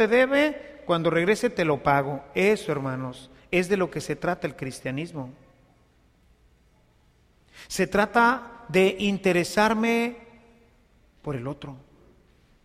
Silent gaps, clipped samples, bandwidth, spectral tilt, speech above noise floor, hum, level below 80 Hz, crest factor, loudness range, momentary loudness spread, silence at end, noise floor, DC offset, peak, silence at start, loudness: none; under 0.1%; 15.5 kHz; -5.5 dB/octave; 37 dB; none; -56 dBFS; 20 dB; 11 LU; 15 LU; 0.85 s; -61 dBFS; under 0.1%; -6 dBFS; 0 s; -24 LUFS